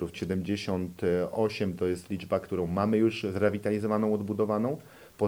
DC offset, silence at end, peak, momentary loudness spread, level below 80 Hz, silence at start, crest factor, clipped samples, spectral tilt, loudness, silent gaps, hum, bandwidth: under 0.1%; 0 s; -12 dBFS; 6 LU; -58 dBFS; 0 s; 18 dB; under 0.1%; -7 dB/octave; -29 LUFS; none; none; 17 kHz